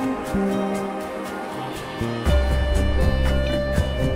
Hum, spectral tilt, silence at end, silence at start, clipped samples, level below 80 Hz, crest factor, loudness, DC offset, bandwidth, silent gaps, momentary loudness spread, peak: none; -6.5 dB/octave; 0 s; 0 s; under 0.1%; -26 dBFS; 14 dB; -24 LUFS; under 0.1%; 15.5 kHz; none; 9 LU; -6 dBFS